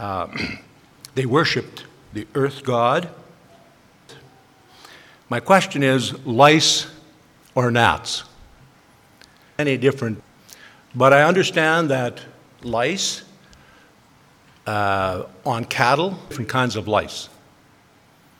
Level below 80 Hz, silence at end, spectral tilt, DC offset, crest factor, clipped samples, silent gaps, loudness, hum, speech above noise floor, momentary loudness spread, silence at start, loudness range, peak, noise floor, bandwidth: -56 dBFS; 1.1 s; -4 dB/octave; under 0.1%; 22 dB; under 0.1%; none; -19 LUFS; none; 35 dB; 20 LU; 0 s; 7 LU; 0 dBFS; -54 dBFS; 17.5 kHz